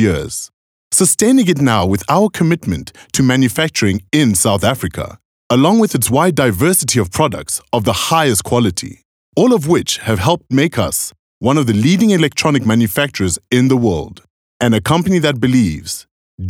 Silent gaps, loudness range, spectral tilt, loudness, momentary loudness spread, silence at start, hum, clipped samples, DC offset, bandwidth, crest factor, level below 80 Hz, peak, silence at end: 0.53-0.91 s, 5.25-5.50 s, 9.05-9.33 s, 11.19-11.41 s, 14.30-14.60 s, 16.11-16.38 s; 2 LU; -4.5 dB/octave; -14 LUFS; 10 LU; 0 s; none; under 0.1%; under 0.1%; 18.5 kHz; 14 dB; -44 dBFS; 0 dBFS; 0 s